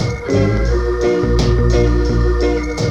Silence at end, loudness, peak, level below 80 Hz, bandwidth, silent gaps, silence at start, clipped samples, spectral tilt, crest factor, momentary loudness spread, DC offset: 0 s; -16 LUFS; -2 dBFS; -18 dBFS; 8.2 kHz; none; 0 s; under 0.1%; -7 dB/octave; 12 dB; 3 LU; under 0.1%